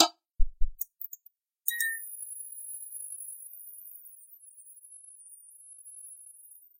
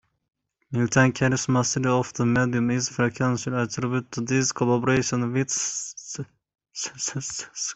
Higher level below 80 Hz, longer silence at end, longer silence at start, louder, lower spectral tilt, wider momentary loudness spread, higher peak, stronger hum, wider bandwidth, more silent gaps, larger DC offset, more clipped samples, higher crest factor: first, -40 dBFS vs -56 dBFS; first, 0.5 s vs 0 s; second, 0 s vs 0.7 s; second, -36 LUFS vs -24 LUFS; second, -1.5 dB/octave vs -4.5 dB/octave; first, 19 LU vs 12 LU; about the same, -4 dBFS vs -2 dBFS; neither; first, 16.5 kHz vs 8.4 kHz; neither; neither; neither; first, 30 dB vs 22 dB